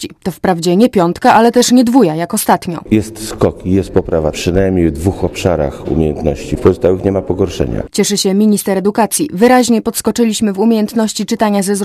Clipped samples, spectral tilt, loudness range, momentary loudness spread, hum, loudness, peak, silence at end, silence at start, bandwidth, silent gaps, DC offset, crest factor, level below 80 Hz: 0.2%; -5 dB/octave; 3 LU; 8 LU; none; -13 LUFS; 0 dBFS; 0 s; 0 s; 15 kHz; none; under 0.1%; 12 dB; -30 dBFS